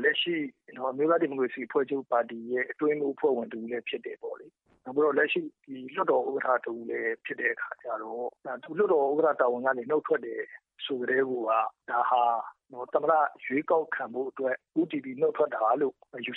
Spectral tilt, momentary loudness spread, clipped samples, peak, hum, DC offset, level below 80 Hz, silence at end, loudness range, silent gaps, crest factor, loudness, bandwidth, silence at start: -8 dB/octave; 12 LU; under 0.1%; -10 dBFS; none; under 0.1%; -86 dBFS; 0 s; 3 LU; none; 18 dB; -29 LUFS; 4.1 kHz; 0 s